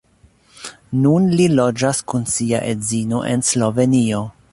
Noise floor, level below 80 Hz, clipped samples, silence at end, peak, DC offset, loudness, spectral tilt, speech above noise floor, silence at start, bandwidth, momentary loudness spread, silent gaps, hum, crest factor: -53 dBFS; -50 dBFS; under 0.1%; 0.2 s; -2 dBFS; under 0.1%; -17 LUFS; -5.5 dB/octave; 37 dB; 0.6 s; 11.5 kHz; 10 LU; none; none; 16 dB